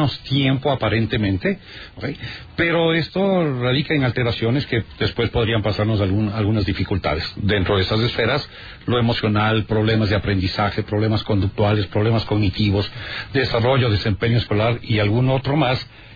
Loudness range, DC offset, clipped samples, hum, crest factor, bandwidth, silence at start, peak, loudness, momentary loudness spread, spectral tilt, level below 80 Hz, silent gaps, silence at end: 1 LU; under 0.1%; under 0.1%; none; 12 dB; 5 kHz; 0 s; -6 dBFS; -20 LUFS; 6 LU; -8 dB/octave; -40 dBFS; none; 0 s